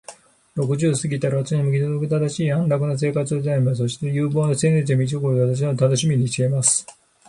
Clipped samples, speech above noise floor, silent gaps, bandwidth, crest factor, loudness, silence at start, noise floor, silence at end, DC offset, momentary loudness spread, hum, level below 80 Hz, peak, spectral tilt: under 0.1%; 25 dB; none; 11.5 kHz; 16 dB; -20 LUFS; 0.1 s; -45 dBFS; 0.4 s; under 0.1%; 4 LU; none; -58 dBFS; -4 dBFS; -5.5 dB/octave